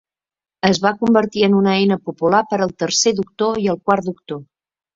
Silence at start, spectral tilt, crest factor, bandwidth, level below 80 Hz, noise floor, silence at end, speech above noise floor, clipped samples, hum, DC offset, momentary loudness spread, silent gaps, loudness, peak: 0.65 s; -4.5 dB/octave; 16 dB; 7.8 kHz; -56 dBFS; under -90 dBFS; 0.55 s; over 73 dB; under 0.1%; none; under 0.1%; 6 LU; none; -17 LUFS; -2 dBFS